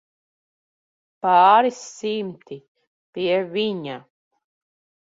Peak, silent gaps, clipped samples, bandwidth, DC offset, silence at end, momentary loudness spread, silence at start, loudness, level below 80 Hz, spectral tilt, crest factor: -2 dBFS; 2.68-2.75 s, 2.87-3.13 s; under 0.1%; 7.8 kHz; under 0.1%; 1.05 s; 24 LU; 1.25 s; -20 LUFS; -72 dBFS; -4.5 dB/octave; 22 dB